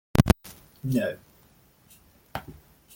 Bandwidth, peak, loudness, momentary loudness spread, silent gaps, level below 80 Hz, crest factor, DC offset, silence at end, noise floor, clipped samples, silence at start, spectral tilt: 17 kHz; -2 dBFS; -28 LUFS; 23 LU; none; -40 dBFS; 28 dB; under 0.1%; 0.45 s; -59 dBFS; under 0.1%; 0.15 s; -6.5 dB/octave